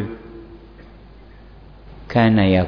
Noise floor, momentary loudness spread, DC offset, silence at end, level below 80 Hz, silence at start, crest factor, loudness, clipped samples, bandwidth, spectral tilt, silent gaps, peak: -43 dBFS; 28 LU; under 0.1%; 0 s; -42 dBFS; 0 s; 16 dB; -17 LUFS; under 0.1%; 5.4 kHz; -9.5 dB/octave; none; -4 dBFS